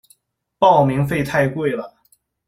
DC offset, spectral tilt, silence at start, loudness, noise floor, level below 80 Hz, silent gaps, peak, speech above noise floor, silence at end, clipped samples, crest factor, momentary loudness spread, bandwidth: under 0.1%; -7 dB/octave; 0.6 s; -18 LUFS; -60 dBFS; -50 dBFS; none; -2 dBFS; 44 dB; 0.6 s; under 0.1%; 18 dB; 12 LU; 15 kHz